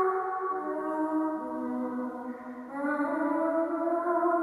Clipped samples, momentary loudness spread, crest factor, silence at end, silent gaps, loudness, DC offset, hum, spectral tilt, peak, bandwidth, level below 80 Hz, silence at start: under 0.1%; 9 LU; 14 dB; 0 s; none; -31 LUFS; under 0.1%; none; -7 dB/octave; -16 dBFS; 11.5 kHz; -76 dBFS; 0 s